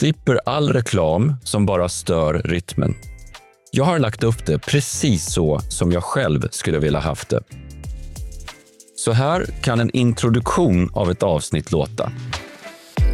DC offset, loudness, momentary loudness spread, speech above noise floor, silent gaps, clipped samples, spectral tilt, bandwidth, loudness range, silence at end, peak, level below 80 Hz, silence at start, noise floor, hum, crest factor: under 0.1%; -20 LUFS; 16 LU; 24 dB; none; under 0.1%; -5.5 dB/octave; 14 kHz; 4 LU; 0 s; -6 dBFS; -34 dBFS; 0 s; -43 dBFS; none; 14 dB